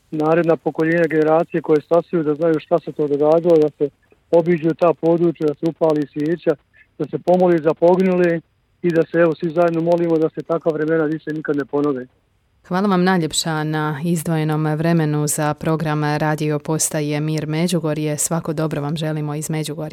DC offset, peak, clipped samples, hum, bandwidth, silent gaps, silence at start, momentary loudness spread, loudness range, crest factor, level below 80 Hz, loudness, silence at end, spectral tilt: under 0.1%; -4 dBFS; under 0.1%; none; 17 kHz; none; 0.1 s; 7 LU; 3 LU; 14 dB; -58 dBFS; -19 LUFS; 0 s; -6 dB/octave